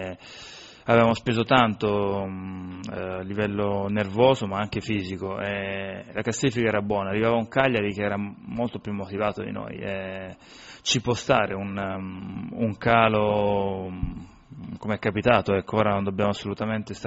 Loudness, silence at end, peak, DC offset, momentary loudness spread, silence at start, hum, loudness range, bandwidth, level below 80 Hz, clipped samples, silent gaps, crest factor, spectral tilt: -25 LUFS; 0 s; -4 dBFS; under 0.1%; 15 LU; 0 s; none; 4 LU; 8 kHz; -50 dBFS; under 0.1%; none; 22 dB; -4.5 dB/octave